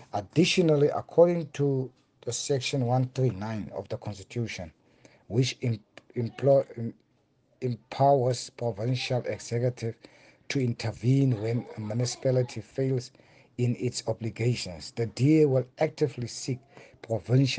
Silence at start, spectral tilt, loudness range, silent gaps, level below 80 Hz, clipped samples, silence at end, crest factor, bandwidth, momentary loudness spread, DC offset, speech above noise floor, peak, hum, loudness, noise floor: 0 s; -6 dB/octave; 4 LU; none; -64 dBFS; under 0.1%; 0 s; 20 dB; 9.6 kHz; 14 LU; under 0.1%; 41 dB; -8 dBFS; none; -28 LUFS; -68 dBFS